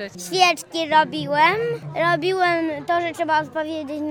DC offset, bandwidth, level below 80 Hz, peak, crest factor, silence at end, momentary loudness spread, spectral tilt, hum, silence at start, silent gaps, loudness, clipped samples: under 0.1%; 19 kHz; -68 dBFS; -2 dBFS; 18 dB; 0 s; 9 LU; -4 dB/octave; none; 0 s; none; -20 LUFS; under 0.1%